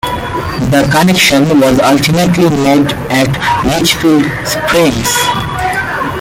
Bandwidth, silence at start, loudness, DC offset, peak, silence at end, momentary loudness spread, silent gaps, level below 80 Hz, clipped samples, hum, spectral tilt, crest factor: 17 kHz; 0.05 s; -10 LUFS; under 0.1%; 0 dBFS; 0 s; 7 LU; none; -32 dBFS; under 0.1%; none; -4.5 dB/octave; 10 dB